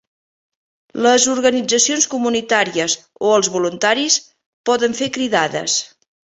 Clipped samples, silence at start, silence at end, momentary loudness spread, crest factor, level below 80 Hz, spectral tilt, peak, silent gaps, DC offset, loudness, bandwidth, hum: under 0.1%; 0.95 s; 0.55 s; 7 LU; 18 dB; -62 dBFS; -1.5 dB/octave; 0 dBFS; 4.46-4.64 s; under 0.1%; -16 LUFS; 8.4 kHz; none